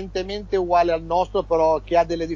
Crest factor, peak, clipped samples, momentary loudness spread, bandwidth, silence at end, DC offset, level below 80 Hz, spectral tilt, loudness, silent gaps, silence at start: 14 dB; -6 dBFS; under 0.1%; 6 LU; 7.4 kHz; 0 s; under 0.1%; -40 dBFS; -6 dB/octave; -21 LUFS; none; 0 s